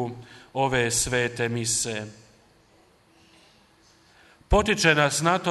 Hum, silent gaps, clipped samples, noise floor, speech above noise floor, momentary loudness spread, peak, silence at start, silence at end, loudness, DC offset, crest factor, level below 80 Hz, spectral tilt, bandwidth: none; none; under 0.1%; -59 dBFS; 35 dB; 15 LU; -4 dBFS; 0 s; 0 s; -23 LUFS; under 0.1%; 22 dB; -40 dBFS; -3 dB/octave; 12 kHz